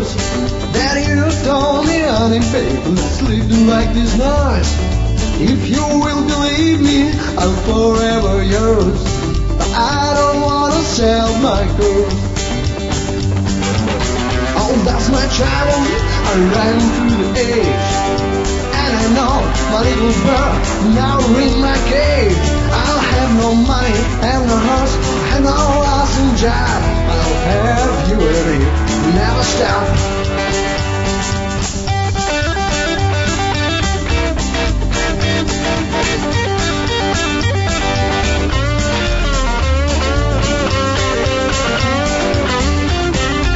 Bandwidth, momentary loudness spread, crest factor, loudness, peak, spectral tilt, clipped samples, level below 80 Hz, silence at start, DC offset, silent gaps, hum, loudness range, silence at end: 8 kHz; 4 LU; 14 dB; -14 LUFS; 0 dBFS; -5 dB/octave; under 0.1%; -20 dBFS; 0 s; 0.2%; none; none; 3 LU; 0 s